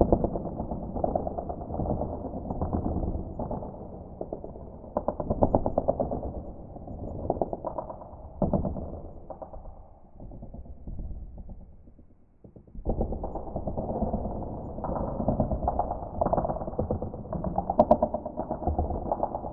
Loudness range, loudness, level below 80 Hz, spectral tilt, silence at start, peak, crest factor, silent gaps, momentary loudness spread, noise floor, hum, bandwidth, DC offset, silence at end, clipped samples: 11 LU; -31 LUFS; -40 dBFS; -13 dB/octave; 0 s; -4 dBFS; 26 dB; none; 17 LU; -54 dBFS; none; 3.9 kHz; under 0.1%; 0 s; under 0.1%